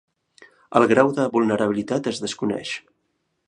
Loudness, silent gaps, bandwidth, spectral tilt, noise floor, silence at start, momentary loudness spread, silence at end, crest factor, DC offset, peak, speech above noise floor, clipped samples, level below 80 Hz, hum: -21 LUFS; none; 10.5 kHz; -5.5 dB/octave; -73 dBFS; 0.7 s; 11 LU; 0.7 s; 22 dB; under 0.1%; -2 dBFS; 52 dB; under 0.1%; -64 dBFS; none